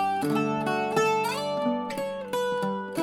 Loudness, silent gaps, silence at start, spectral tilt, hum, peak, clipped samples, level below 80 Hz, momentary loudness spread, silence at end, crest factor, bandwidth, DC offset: -27 LUFS; none; 0 s; -5 dB/octave; none; -12 dBFS; under 0.1%; -68 dBFS; 6 LU; 0 s; 16 dB; 18 kHz; under 0.1%